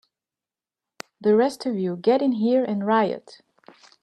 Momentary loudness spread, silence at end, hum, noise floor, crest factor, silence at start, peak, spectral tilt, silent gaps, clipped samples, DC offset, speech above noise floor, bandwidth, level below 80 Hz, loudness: 12 LU; 0.85 s; none; under -90 dBFS; 16 dB; 1.2 s; -8 dBFS; -6.5 dB/octave; none; under 0.1%; under 0.1%; over 68 dB; 12.5 kHz; -74 dBFS; -22 LUFS